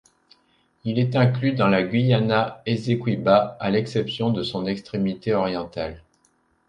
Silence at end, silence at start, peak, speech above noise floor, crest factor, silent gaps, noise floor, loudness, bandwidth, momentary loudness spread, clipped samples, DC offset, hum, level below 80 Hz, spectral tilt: 0.7 s; 0.85 s; -4 dBFS; 43 dB; 18 dB; none; -65 dBFS; -22 LUFS; 9.2 kHz; 8 LU; under 0.1%; under 0.1%; none; -54 dBFS; -8 dB/octave